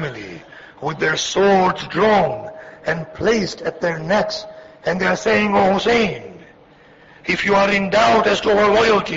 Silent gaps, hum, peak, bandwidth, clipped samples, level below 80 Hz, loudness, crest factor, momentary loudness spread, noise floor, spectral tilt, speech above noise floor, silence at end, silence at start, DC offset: none; none; -4 dBFS; 8 kHz; under 0.1%; -48 dBFS; -17 LUFS; 14 dB; 14 LU; -47 dBFS; -4.5 dB/octave; 31 dB; 0 s; 0 s; under 0.1%